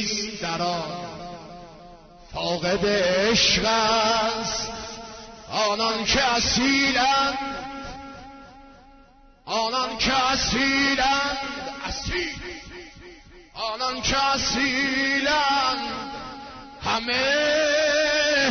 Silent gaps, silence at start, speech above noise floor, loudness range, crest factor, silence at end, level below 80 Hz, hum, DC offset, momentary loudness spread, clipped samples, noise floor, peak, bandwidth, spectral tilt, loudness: none; 0 s; 29 dB; 5 LU; 16 dB; 0 s; -46 dBFS; none; under 0.1%; 18 LU; under 0.1%; -52 dBFS; -8 dBFS; 6.6 kHz; -2.5 dB/octave; -22 LUFS